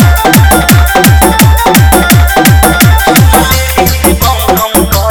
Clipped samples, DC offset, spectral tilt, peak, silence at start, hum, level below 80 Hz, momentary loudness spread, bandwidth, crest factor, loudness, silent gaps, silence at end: 6%; under 0.1%; -4.5 dB/octave; 0 dBFS; 0 s; none; -12 dBFS; 3 LU; over 20 kHz; 6 dB; -5 LUFS; none; 0 s